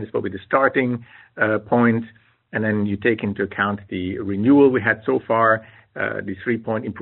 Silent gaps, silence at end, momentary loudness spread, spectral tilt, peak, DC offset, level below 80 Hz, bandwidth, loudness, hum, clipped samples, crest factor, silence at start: none; 0 s; 11 LU; -5.5 dB/octave; -2 dBFS; under 0.1%; -60 dBFS; 4.2 kHz; -20 LUFS; none; under 0.1%; 18 dB; 0 s